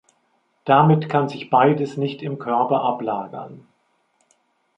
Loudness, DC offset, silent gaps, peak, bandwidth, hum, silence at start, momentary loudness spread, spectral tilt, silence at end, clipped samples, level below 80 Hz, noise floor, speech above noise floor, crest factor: -20 LUFS; under 0.1%; none; -2 dBFS; 7.8 kHz; none; 0.65 s; 18 LU; -8.5 dB/octave; 1.2 s; under 0.1%; -68 dBFS; -66 dBFS; 47 dB; 20 dB